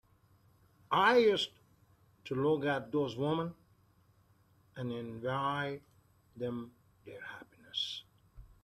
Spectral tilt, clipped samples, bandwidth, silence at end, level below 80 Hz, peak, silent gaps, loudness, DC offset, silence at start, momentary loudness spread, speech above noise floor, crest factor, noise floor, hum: -5.5 dB/octave; under 0.1%; 13.5 kHz; 0.15 s; -68 dBFS; -14 dBFS; none; -34 LUFS; under 0.1%; 0.9 s; 21 LU; 35 dB; 22 dB; -68 dBFS; none